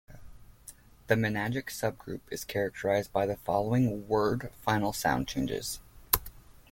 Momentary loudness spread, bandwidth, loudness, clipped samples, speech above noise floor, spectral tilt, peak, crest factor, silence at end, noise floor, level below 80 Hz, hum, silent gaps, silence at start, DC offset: 14 LU; 17 kHz; -30 LUFS; under 0.1%; 23 dB; -5 dB/octave; -4 dBFS; 28 dB; 0.15 s; -53 dBFS; -52 dBFS; none; none; 0.1 s; under 0.1%